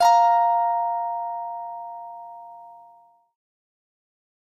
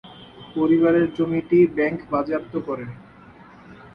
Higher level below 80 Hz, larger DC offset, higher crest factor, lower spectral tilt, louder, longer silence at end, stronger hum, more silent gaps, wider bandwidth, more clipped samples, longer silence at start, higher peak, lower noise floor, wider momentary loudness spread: second, -78 dBFS vs -56 dBFS; neither; about the same, 18 dB vs 16 dB; second, 0 dB/octave vs -9.5 dB/octave; about the same, -22 LUFS vs -21 LUFS; first, 1.75 s vs 0.1 s; neither; neither; first, 14.5 kHz vs 5.2 kHz; neither; about the same, 0 s vs 0.05 s; about the same, -6 dBFS vs -6 dBFS; first, -54 dBFS vs -46 dBFS; first, 24 LU vs 15 LU